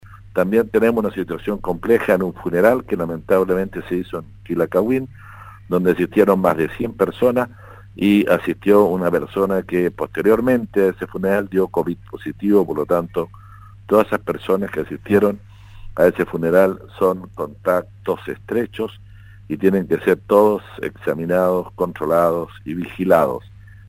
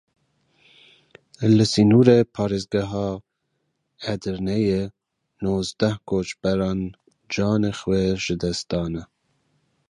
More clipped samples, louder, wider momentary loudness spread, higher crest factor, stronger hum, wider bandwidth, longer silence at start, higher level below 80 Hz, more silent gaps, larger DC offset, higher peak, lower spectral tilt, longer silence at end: neither; first, -19 LUFS vs -22 LUFS; second, 11 LU vs 14 LU; about the same, 18 dB vs 22 dB; neither; first, 16.5 kHz vs 11 kHz; second, 0.05 s vs 1.4 s; about the same, -46 dBFS vs -46 dBFS; neither; neither; about the same, 0 dBFS vs -2 dBFS; about the same, -7.5 dB/octave vs -6.5 dB/octave; second, 0.15 s vs 0.85 s